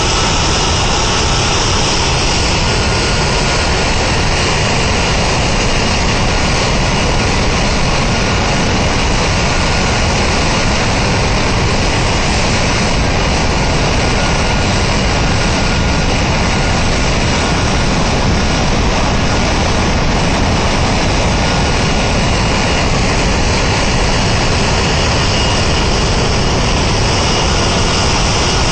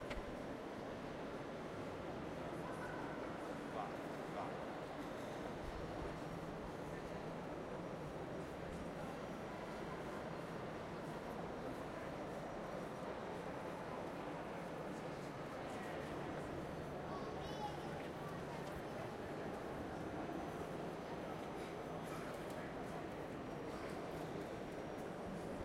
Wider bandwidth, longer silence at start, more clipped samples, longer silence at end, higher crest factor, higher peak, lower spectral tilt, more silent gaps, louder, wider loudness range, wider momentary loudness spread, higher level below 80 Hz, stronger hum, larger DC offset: second, 10 kHz vs 16 kHz; about the same, 0 s vs 0 s; neither; about the same, 0 s vs 0 s; second, 8 dB vs 14 dB; first, -4 dBFS vs -32 dBFS; second, -4 dB/octave vs -6 dB/octave; neither; first, -13 LUFS vs -47 LUFS; about the same, 1 LU vs 1 LU; about the same, 1 LU vs 2 LU; first, -18 dBFS vs -64 dBFS; neither; neither